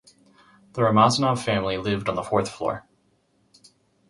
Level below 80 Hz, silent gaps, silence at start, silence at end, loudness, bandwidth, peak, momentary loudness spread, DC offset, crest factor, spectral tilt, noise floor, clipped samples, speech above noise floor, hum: -54 dBFS; none; 0.75 s; 1.3 s; -23 LUFS; 11.5 kHz; -2 dBFS; 12 LU; under 0.1%; 22 dB; -5.5 dB/octave; -66 dBFS; under 0.1%; 43 dB; none